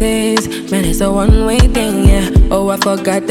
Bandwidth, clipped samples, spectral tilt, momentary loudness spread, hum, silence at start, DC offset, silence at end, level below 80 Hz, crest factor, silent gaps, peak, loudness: 16.5 kHz; under 0.1%; -5.5 dB/octave; 5 LU; none; 0 s; under 0.1%; 0 s; -16 dBFS; 10 dB; none; 0 dBFS; -13 LUFS